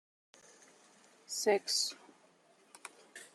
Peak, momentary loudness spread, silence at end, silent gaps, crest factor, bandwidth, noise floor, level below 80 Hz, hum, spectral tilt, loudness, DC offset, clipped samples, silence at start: -18 dBFS; 22 LU; 0.1 s; none; 22 dB; 14.5 kHz; -67 dBFS; under -90 dBFS; none; -0.5 dB/octave; -33 LUFS; under 0.1%; under 0.1%; 1.3 s